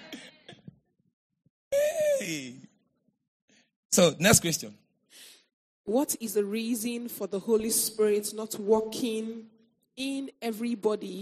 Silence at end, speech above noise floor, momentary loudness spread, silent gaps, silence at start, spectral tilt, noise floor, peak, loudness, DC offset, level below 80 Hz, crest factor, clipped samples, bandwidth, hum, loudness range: 0 s; 46 dB; 16 LU; 1.13-1.30 s, 1.50-1.71 s, 3.28-3.48 s, 3.76-3.90 s, 5.53-5.84 s; 0 s; -3.5 dB/octave; -74 dBFS; -6 dBFS; -28 LUFS; under 0.1%; -62 dBFS; 24 dB; under 0.1%; 15 kHz; none; 7 LU